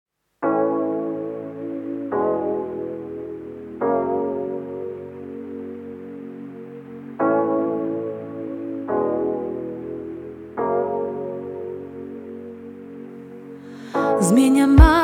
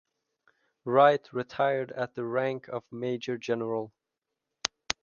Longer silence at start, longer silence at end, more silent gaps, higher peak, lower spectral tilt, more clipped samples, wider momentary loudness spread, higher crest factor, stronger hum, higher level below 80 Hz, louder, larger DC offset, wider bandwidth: second, 0.4 s vs 0.85 s; about the same, 0 s vs 0.1 s; neither; about the same, 0 dBFS vs -2 dBFS; first, -7 dB/octave vs -4.5 dB/octave; neither; first, 18 LU vs 14 LU; second, 22 dB vs 28 dB; neither; first, -30 dBFS vs -70 dBFS; first, -23 LUFS vs -29 LUFS; neither; first, 15.5 kHz vs 7.2 kHz